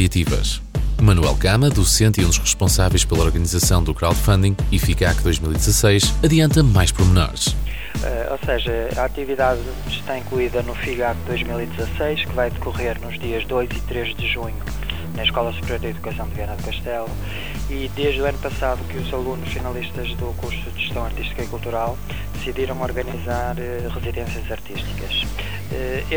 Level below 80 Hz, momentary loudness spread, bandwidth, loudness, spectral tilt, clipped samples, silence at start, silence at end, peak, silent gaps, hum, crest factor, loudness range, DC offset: -26 dBFS; 12 LU; 20 kHz; -21 LUFS; -4.5 dB/octave; under 0.1%; 0 s; 0 s; -4 dBFS; none; none; 16 dB; 9 LU; under 0.1%